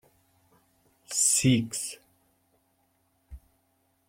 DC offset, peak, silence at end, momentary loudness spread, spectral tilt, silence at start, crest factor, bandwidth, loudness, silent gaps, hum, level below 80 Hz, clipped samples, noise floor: under 0.1%; -8 dBFS; 0.7 s; 16 LU; -3.5 dB/octave; 1.1 s; 24 dB; 16.5 kHz; -25 LUFS; none; none; -58 dBFS; under 0.1%; -71 dBFS